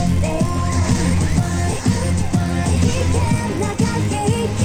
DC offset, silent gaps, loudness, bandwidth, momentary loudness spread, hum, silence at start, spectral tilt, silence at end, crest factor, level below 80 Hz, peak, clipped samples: under 0.1%; none; -19 LUFS; 15.5 kHz; 2 LU; none; 0 s; -6 dB/octave; 0 s; 14 dB; -28 dBFS; -4 dBFS; under 0.1%